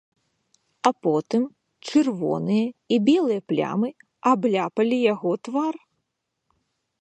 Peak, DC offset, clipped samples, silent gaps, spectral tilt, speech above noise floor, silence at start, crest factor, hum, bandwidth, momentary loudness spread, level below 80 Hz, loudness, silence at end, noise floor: -4 dBFS; under 0.1%; under 0.1%; none; -6.5 dB/octave; 57 dB; 0.85 s; 20 dB; none; 9 kHz; 7 LU; -72 dBFS; -23 LUFS; 1.25 s; -79 dBFS